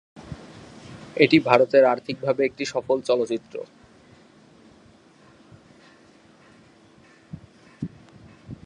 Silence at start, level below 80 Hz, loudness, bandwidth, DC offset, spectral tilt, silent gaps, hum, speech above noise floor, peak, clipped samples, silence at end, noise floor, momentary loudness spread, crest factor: 0.15 s; -60 dBFS; -21 LUFS; 10.5 kHz; under 0.1%; -5.5 dB/octave; none; none; 33 dB; 0 dBFS; under 0.1%; 0.1 s; -53 dBFS; 27 LU; 26 dB